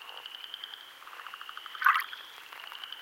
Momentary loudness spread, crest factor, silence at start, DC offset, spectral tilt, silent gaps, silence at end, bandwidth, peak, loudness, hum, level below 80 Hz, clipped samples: 19 LU; 28 dB; 0 s; under 0.1%; 2.5 dB/octave; none; 0 s; 17 kHz; -8 dBFS; -33 LUFS; none; -90 dBFS; under 0.1%